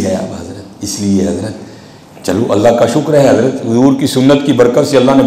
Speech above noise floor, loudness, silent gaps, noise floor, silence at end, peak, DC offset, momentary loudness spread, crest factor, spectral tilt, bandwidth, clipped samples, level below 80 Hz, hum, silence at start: 25 dB; -11 LUFS; none; -35 dBFS; 0 s; 0 dBFS; under 0.1%; 15 LU; 10 dB; -6 dB/octave; 15.5 kHz; under 0.1%; -44 dBFS; none; 0 s